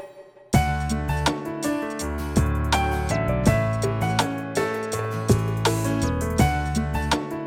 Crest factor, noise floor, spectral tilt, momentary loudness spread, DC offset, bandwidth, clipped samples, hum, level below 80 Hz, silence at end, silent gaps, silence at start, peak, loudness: 18 dB; -45 dBFS; -5.5 dB/octave; 6 LU; under 0.1%; 17 kHz; under 0.1%; none; -32 dBFS; 0 s; none; 0 s; -6 dBFS; -24 LUFS